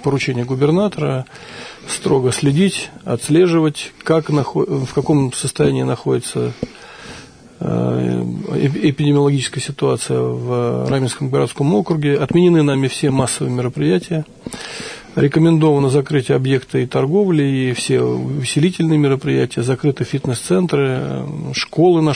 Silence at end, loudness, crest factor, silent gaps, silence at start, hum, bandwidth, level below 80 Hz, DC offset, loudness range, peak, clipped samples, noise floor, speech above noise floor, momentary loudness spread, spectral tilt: 0 s; -17 LUFS; 14 dB; none; 0 s; none; 11 kHz; -50 dBFS; under 0.1%; 3 LU; -4 dBFS; under 0.1%; -38 dBFS; 22 dB; 11 LU; -6 dB/octave